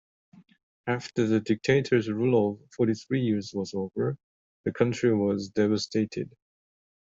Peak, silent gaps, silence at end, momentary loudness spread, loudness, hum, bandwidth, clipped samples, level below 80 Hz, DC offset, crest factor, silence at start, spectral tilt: -10 dBFS; 4.23-4.64 s; 0.8 s; 10 LU; -27 LUFS; none; 7.8 kHz; under 0.1%; -64 dBFS; under 0.1%; 18 dB; 0.85 s; -6.5 dB/octave